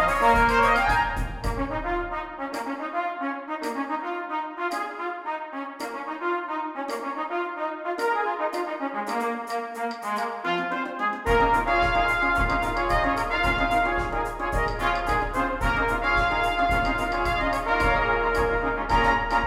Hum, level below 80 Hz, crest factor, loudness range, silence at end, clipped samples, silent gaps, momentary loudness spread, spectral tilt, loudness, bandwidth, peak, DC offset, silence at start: none; -36 dBFS; 18 dB; 7 LU; 0 s; under 0.1%; none; 10 LU; -5 dB/octave; -25 LUFS; 16 kHz; -8 dBFS; under 0.1%; 0 s